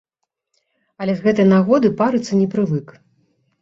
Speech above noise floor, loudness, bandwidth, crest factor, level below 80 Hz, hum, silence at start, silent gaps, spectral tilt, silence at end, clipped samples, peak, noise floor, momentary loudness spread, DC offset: 58 dB; -17 LUFS; 7.6 kHz; 16 dB; -58 dBFS; none; 1 s; none; -7.5 dB/octave; 0.75 s; under 0.1%; -2 dBFS; -74 dBFS; 10 LU; under 0.1%